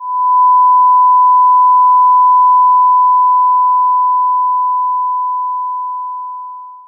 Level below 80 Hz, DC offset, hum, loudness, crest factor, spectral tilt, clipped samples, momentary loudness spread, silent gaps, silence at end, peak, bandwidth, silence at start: under -90 dBFS; under 0.1%; none; -9 LUFS; 6 dB; -1.5 dB/octave; under 0.1%; 13 LU; none; 0.1 s; -4 dBFS; 1.1 kHz; 0 s